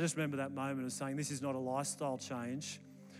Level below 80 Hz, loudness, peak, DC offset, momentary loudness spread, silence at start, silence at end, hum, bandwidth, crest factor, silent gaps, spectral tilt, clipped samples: under -90 dBFS; -39 LUFS; -24 dBFS; under 0.1%; 5 LU; 0 s; 0 s; none; 15.5 kHz; 16 dB; none; -4.5 dB/octave; under 0.1%